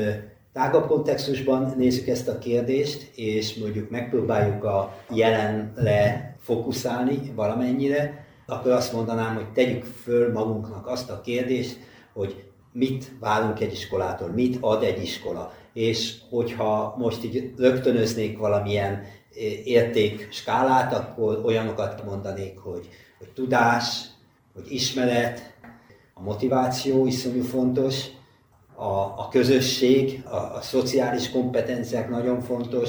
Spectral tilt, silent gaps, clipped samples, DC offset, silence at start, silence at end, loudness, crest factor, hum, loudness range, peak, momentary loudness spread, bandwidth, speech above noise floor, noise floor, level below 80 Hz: -5.5 dB/octave; none; under 0.1%; under 0.1%; 0 s; 0 s; -25 LUFS; 18 dB; none; 3 LU; -6 dBFS; 12 LU; over 20 kHz; 33 dB; -57 dBFS; -56 dBFS